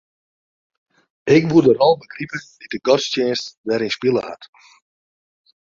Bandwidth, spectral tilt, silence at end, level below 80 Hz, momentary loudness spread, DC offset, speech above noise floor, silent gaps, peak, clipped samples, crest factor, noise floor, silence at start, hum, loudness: 7.6 kHz; -5.5 dB/octave; 1.15 s; -58 dBFS; 17 LU; under 0.1%; over 72 dB; 3.57-3.64 s; -2 dBFS; under 0.1%; 18 dB; under -90 dBFS; 1.25 s; none; -18 LUFS